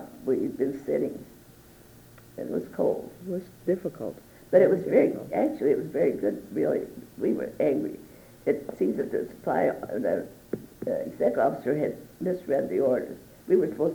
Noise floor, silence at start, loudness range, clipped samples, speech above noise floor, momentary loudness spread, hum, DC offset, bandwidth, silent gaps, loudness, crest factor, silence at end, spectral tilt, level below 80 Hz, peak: -52 dBFS; 0 s; 7 LU; under 0.1%; 25 dB; 13 LU; none; under 0.1%; over 20 kHz; none; -27 LUFS; 20 dB; 0 s; -8 dB/octave; -62 dBFS; -8 dBFS